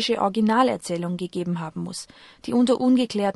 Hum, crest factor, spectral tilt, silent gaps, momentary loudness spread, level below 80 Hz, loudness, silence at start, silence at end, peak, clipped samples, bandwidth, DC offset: none; 16 dB; -5.5 dB/octave; none; 14 LU; -62 dBFS; -23 LUFS; 0 s; 0.05 s; -6 dBFS; under 0.1%; 12 kHz; under 0.1%